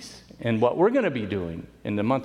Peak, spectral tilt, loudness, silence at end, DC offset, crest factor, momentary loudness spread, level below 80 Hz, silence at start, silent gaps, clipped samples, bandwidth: -8 dBFS; -7 dB/octave; -25 LUFS; 0 s; under 0.1%; 18 dB; 14 LU; -56 dBFS; 0 s; none; under 0.1%; 11.5 kHz